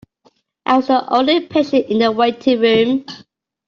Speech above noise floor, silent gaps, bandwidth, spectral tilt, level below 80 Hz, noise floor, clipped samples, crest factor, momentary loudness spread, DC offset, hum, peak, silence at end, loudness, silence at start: 43 dB; none; 7 kHz; -6 dB/octave; -60 dBFS; -57 dBFS; under 0.1%; 14 dB; 10 LU; under 0.1%; none; -2 dBFS; 0.5 s; -15 LUFS; 0.65 s